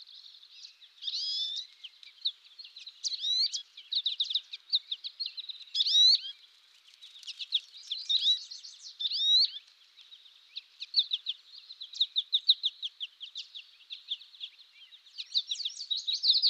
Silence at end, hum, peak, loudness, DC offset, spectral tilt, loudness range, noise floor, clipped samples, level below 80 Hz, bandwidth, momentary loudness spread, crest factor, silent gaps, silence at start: 0 s; none; -12 dBFS; -28 LUFS; under 0.1%; 9 dB/octave; 6 LU; -60 dBFS; under 0.1%; under -90 dBFS; 12.5 kHz; 22 LU; 20 dB; none; 0 s